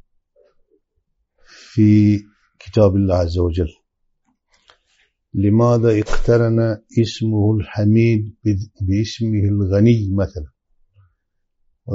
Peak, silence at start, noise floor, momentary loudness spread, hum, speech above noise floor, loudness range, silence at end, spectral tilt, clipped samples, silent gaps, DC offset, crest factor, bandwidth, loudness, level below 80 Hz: -2 dBFS; 1.75 s; -69 dBFS; 9 LU; none; 54 dB; 3 LU; 0 s; -8.5 dB/octave; under 0.1%; none; under 0.1%; 16 dB; 7.6 kHz; -17 LUFS; -34 dBFS